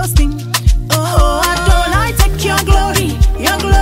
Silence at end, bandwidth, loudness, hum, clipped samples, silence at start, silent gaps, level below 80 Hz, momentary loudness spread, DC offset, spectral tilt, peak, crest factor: 0 s; 16.5 kHz; -13 LUFS; none; under 0.1%; 0 s; none; -14 dBFS; 3 LU; under 0.1%; -4.5 dB/octave; 0 dBFS; 12 dB